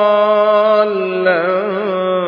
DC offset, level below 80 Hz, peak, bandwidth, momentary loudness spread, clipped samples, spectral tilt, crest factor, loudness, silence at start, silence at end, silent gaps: under 0.1%; -72 dBFS; -2 dBFS; 5.2 kHz; 6 LU; under 0.1%; -7.5 dB/octave; 12 dB; -14 LUFS; 0 s; 0 s; none